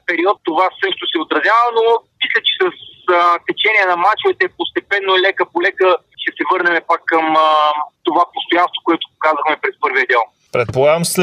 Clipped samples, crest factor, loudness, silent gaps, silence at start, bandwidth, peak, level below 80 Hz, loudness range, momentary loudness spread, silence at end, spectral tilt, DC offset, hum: under 0.1%; 14 dB; -15 LUFS; none; 0.1 s; 15.5 kHz; -2 dBFS; -60 dBFS; 2 LU; 6 LU; 0 s; -3.5 dB/octave; under 0.1%; none